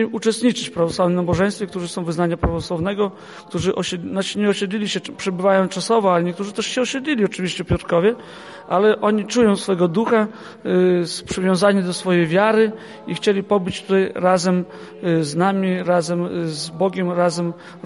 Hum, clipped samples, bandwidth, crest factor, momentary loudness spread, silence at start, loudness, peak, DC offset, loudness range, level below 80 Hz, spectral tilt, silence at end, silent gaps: none; under 0.1%; 11.5 kHz; 18 dB; 9 LU; 0 s; -20 LUFS; -2 dBFS; under 0.1%; 4 LU; -44 dBFS; -5.5 dB/octave; 0.05 s; none